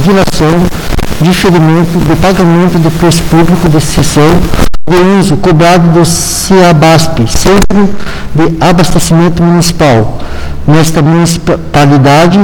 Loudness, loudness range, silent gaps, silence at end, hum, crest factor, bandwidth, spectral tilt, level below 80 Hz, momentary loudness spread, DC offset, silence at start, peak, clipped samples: -6 LUFS; 2 LU; none; 0 s; none; 4 dB; 18.5 kHz; -5.5 dB/octave; -18 dBFS; 7 LU; under 0.1%; 0 s; 0 dBFS; 3%